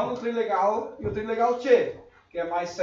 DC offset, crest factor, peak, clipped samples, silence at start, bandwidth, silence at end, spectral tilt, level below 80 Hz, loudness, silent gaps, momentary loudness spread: under 0.1%; 18 dB; -8 dBFS; under 0.1%; 0 s; 7.4 kHz; 0 s; -5.5 dB/octave; -54 dBFS; -26 LUFS; none; 11 LU